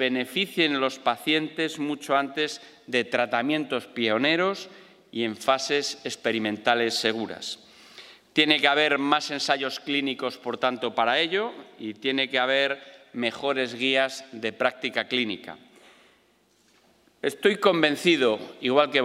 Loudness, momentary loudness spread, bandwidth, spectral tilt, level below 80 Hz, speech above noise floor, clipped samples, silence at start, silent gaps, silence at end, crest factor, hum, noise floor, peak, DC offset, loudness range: -25 LUFS; 11 LU; 16 kHz; -3.5 dB/octave; -78 dBFS; 38 dB; under 0.1%; 0 s; none; 0 s; 24 dB; none; -64 dBFS; -2 dBFS; under 0.1%; 3 LU